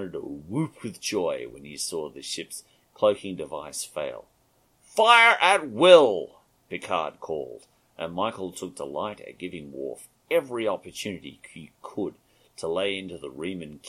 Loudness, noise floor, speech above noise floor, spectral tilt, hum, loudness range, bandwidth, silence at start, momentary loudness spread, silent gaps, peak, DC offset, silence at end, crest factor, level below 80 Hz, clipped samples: -24 LUFS; -65 dBFS; 40 dB; -3.5 dB/octave; none; 13 LU; 14 kHz; 0 s; 22 LU; none; -2 dBFS; under 0.1%; 0 s; 24 dB; -66 dBFS; under 0.1%